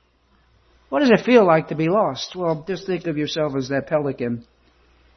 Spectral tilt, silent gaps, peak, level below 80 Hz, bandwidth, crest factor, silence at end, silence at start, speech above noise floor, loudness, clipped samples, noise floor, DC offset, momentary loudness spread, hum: -6.5 dB/octave; none; -2 dBFS; -56 dBFS; 6.4 kHz; 20 dB; 0.75 s; 0.9 s; 40 dB; -20 LUFS; under 0.1%; -60 dBFS; under 0.1%; 12 LU; none